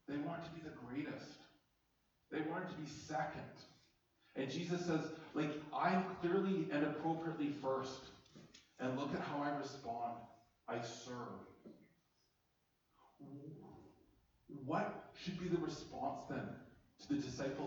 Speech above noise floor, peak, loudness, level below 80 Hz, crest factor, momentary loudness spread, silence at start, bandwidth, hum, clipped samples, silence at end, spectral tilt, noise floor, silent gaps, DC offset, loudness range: 39 dB; -24 dBFS; -43 LUFS; -74 dBFS; 20 dB; 20 LU; 0.1 s; over 20 kHz; none; under 0.1%; 0 s; -6 dB/octave; -81 dBFS; none; under 0.1%; 13 LU